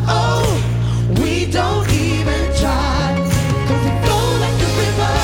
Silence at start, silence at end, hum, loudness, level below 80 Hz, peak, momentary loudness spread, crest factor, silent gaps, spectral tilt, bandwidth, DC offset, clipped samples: 0 s; 0 s; none; -17 LUFS; -24 dBFS; -2 dBFS; 2 LU; 14 dB; none; -5.5 dB/octave; 17 kHz; under 0.1%; under 0.1%